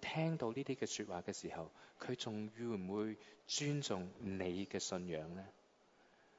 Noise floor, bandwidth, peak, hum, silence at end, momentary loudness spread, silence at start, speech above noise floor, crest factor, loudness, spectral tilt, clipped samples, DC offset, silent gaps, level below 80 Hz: -71 dBFS; 7.6 kHz; -26 dBFS; none; 0.85 s; 12 LU; 0 s; 28 dB; 18 dB; -43 LUFS; -5 dB/octave; under 0.1%; under 0.1%; none; -76 dBFS